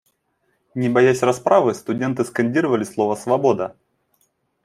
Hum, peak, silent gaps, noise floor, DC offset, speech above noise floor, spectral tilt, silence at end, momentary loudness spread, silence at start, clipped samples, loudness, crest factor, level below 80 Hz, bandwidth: none; -2 dBFS; none; -68 dBFS; under 0.1%; 50 dB; -6 dB/octave; 0.95 s; 8 LU; 0.75 s; under 0.1%; -19 LUFS; 18 dB; -64 dBFS; 13.5 kHz